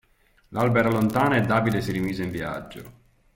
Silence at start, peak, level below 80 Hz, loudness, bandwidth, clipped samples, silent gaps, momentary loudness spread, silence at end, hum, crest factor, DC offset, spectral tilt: 0.5 s; -8 dBFS; -50 dBFS; -24 LUFS; 17 kHz; under 0.1%; none; 14 LU; 0.45 s; none; 16 dB; under 0.1%; -7 dB/octave